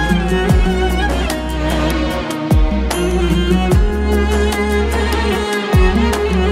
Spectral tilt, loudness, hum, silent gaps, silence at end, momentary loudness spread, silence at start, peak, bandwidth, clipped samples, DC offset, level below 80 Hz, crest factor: -6 dB/octave; -16 LUFS; none; none; 0 s; 4 LU; 0 s; 0 dBFS; 15.5 kHz; under 0.1%; under 0.1%; -18 dBFS; 14 dB